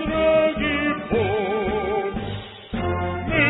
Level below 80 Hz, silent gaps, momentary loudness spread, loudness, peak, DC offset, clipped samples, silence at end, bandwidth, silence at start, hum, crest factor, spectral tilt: -40 dBFS; none; 11 LU; -23 LUFS; -6 dBFS; under 0.1%; under 0.1%; 0 s; 4.1 kHz; 0 s; none; 16 dB; -11 dB/octave